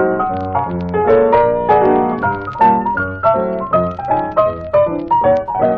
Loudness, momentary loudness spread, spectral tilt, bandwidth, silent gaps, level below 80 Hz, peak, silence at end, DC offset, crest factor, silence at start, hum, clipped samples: -15 LUFS; 7 LU; -9.5 dB/octave; 5.6 kHz; none; -42 dBFS; 0 dBFS; 0 s; under 0.1%; 14 dB; 0 s; none; under 0.1%